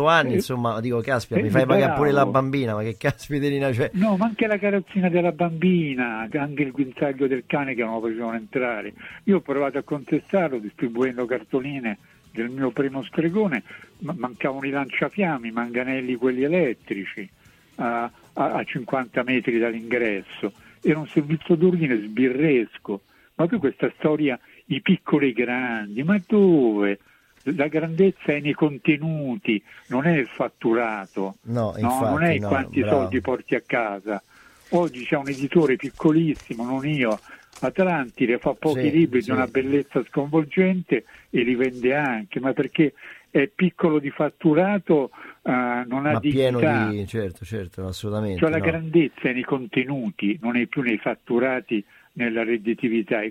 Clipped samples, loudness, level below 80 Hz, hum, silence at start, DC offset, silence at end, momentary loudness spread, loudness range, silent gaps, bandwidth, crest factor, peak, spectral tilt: under 0.1%; -23 LUFS; -58 dBFS; none; 0 s; under 0.1%; 0 s; 9 LU; 4 LU; none; 15.5 kHz; 18 dB; -4 dBFS; -7.5 dB/octave